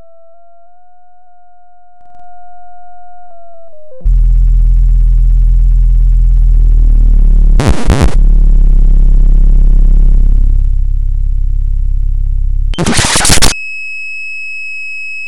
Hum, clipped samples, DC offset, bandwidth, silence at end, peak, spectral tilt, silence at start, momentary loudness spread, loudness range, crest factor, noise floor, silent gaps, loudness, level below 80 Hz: none; 3%; 7%; 12 kHz; 0 s; 0 dBFS; -4 dB/octave; 2.15 s; 9 LU; 5 LU; 8 dB; -45 dBFS; none; -12 LUFS; -8 dBFS